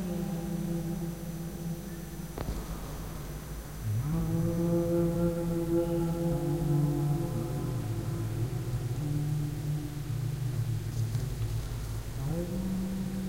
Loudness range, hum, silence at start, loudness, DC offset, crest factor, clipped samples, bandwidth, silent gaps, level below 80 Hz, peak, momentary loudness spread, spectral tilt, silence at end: 7 LU; none; 0 s; -33 LUFS; under 0.1%; 16 dB; under 0.1%; 16 kHz; none; -42 dBFS; -16 dBFS; 10 LU; -7.5 dB/octave; 0 s